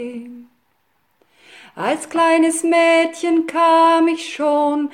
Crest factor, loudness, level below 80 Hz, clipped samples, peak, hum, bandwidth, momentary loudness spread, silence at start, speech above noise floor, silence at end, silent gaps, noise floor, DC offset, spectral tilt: 12 dB; -16 LUFS; -70 dBFS; under 0.1%; -4 dBFS; none; 14.5 kHz; 10 LU; 0 s; 49 dB; 0.05 s; none; -65 dBFS; under 0.1%; -3 dB/octave